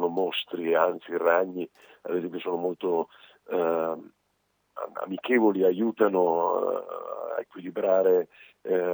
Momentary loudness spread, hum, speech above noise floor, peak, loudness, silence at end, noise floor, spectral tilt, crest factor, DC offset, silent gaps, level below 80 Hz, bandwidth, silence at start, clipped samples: 14 LU; none; 47 dB; -8 dBFS; -27 LUFS; 0 s; -73 dBFS; -7.5 dB/octave; 20 dB; under 0.1%; none; -86 dBFS; over 20 kHz; 0 s; under 0.1%